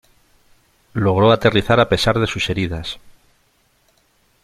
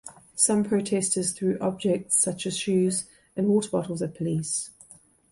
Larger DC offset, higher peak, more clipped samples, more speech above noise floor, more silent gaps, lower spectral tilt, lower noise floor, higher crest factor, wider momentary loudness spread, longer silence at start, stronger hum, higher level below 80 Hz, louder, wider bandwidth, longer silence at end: neither; first, -2 dBFS vs -6 dBFS; neither; first, 44 dB vs 29 dB; neither; first, -6 dB/octave vs -4.5 dB/octave; first, -60 dBFS vs -54 dBFS; about the same, 18 dB vs 20 dB; first, 15 LU vs 8 LU; first, 0.95 s vs 0.05 s; neither; first, -42 dBFS vs -64 dBFS; first, -17 LUFS vs -25 LUFS; first, 14 kHz vs 12 kHz; first, 1.35 s vs 0.6 s